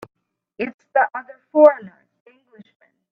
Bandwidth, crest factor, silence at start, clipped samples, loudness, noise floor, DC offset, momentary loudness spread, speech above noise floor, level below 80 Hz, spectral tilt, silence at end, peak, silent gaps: 4.9 kHz; 20 dB; 0.6 s; under 0.1%; -18 LUFS; -49 dBFS; under 0.1%; 17 LU; 32 dB; -72 dBFS; -7.5 dB/octave; 1.25 s; 0 dBFS; 0.74-0.79 s